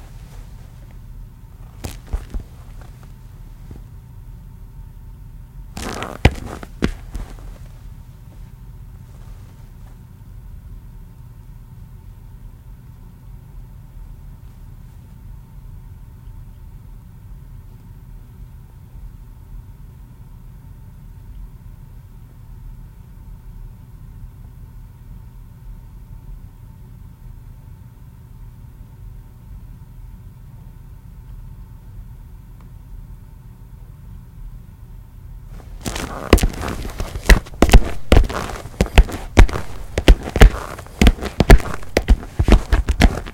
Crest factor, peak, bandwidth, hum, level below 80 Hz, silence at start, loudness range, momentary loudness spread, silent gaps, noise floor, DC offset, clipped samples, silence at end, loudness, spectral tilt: 22 dB; 0 dBFS; 16.5 kHz; none; -22 dBFS; 0.1 s; 24 LU; 25 LU; none; -40 dBFS; under 0.1%; 0.1%; 0 s; -19 LUFS; -5.5 dB/octave